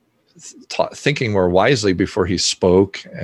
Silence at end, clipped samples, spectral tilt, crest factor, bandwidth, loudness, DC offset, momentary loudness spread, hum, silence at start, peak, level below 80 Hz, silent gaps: 0 s; under 0.1%; -4.5 dB/octave; 16 dB; 12 kHz; -17 LUFS; under 0.1%; 8 LU; none; 0.45 s; -2 dBFS; -40 dBFS; none